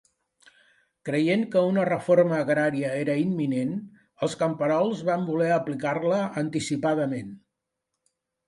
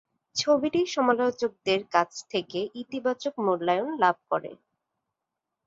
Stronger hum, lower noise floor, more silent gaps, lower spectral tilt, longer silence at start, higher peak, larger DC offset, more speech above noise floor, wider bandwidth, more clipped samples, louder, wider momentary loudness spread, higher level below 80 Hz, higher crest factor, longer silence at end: neither; about the same, -83 dBFS vs -86 dBFS; neither; first, -6.5 dB/octave vs -4 dB/octave; first, 1.05 s vs 0.35 s; about the same, -8 dBFS vs -8 dBFS; neither; about the same, 58 dB vs 59 dB; first, 11.5 kHz vs 7.8 kHz; neither; about the same, -25 LUFS vs -27 LUFS; about the same, 9 LU vs 9 LU; about the same, -70 dBFS vs -72 dBFS; about the same, 18 dB vs 20 dB; about the same, 1.1 s vs 1.15 s